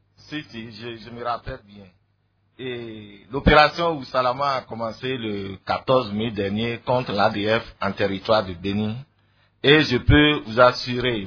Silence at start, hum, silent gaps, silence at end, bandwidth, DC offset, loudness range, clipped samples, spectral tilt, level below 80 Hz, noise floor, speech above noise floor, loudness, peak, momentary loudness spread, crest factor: 0.3 s; none; none; 0 s; 5.4 kHz; under 0.1%; 5 LU; under 0.1%; -6.5 dB/octave; -38 dBFS; -66 dBFS; 44 dB; -21 LUFS; 0 dBFS; 19 LU; 22 dB